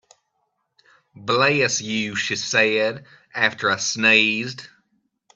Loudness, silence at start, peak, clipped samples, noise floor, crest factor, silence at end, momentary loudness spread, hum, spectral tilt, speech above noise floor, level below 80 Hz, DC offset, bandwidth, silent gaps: -19 LUFS; 1.15 s; -2 dBFS; under 0.1%; -73 dBFS; 22 dB; 0.7 s; 17 LU; none; -2.5 dB/octave; 52 dB; -66 dBFS; under 0.1%; 8.6 kHz; none